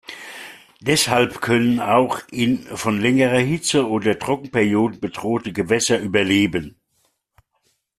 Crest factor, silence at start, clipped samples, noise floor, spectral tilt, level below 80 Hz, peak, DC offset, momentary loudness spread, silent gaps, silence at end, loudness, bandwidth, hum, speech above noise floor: 18 dB; 0.1 s; under 0.1%; -68 dBFS; -4.5 dB/octave; -54 dBFS; -2 dBFS; under 0.1%; 11 LU; none; 1.3 s; -19 LUFS; 14 kHz; none; 49 dB